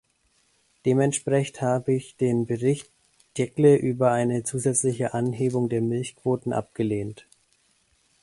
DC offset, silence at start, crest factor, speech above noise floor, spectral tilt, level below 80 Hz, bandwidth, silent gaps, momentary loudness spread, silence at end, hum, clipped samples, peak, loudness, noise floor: under 0.1%; 0.85 s; 18 dB; 43 dB; -6 dB/octave; -62 dBFS; 11.5 kHz; none; 9 LU; 1.05 s; none; under 0.1%; -6 dBFS; -24 LUFS; -67 dBFS